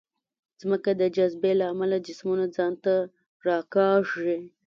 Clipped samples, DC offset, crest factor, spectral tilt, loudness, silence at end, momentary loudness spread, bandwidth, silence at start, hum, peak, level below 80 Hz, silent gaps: under 0.1%; under 0.1%; 16 dB; -7 dB/octave; -26 LUFS; 0.2 s; 7 LU; 7.2 kHz; 0.65 s; none; -10 dBFS; -72 dBFS; 3.26-3.40 s